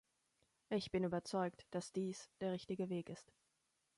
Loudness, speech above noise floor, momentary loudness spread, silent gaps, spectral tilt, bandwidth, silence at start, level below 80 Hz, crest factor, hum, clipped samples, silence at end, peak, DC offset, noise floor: -43 LUFS; 41 dB; 6 LU; none; -6 dB/octave; 11.5 kHz; 0.7 s; -76 dBFS; 18 dB; none; under 0.1%; 0.75 s; -26 dBFS; under 0.1%; -84 dBFS